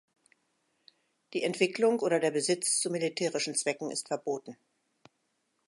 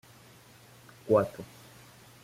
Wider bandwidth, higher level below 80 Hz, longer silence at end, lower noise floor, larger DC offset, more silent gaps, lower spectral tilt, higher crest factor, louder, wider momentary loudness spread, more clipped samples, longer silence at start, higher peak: second, 11.5 kHz vs 16 kHz; second, -86 dBFS vs -66 dBFS; first, 1.15 s vs 0.8 s; first, -78 dBFS vs -55 dBFS; neither; neither; second, -3 dB/octave vs -7 dB/octave; about the same, 20 dB vs 22 dB; about the same, -30 LUFS vs -28 LUFS; second, 9 LU vs 26 LU; neither; first, 1.3 s vs 1.05 s; about the same, -12 dBFS vs -12 dBFS